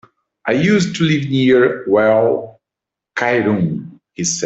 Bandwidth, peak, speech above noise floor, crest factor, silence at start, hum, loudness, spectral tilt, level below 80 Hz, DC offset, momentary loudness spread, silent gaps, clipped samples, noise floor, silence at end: 8.2 kHz; -2 dBFS; 70 dB; 14 dB; 0.45 s; none; -15 LUFS; -5 dB/octave; -54 dBFS; under 0.1%; 14 LU; none; under 0.1%; -84 dBFS; 0 s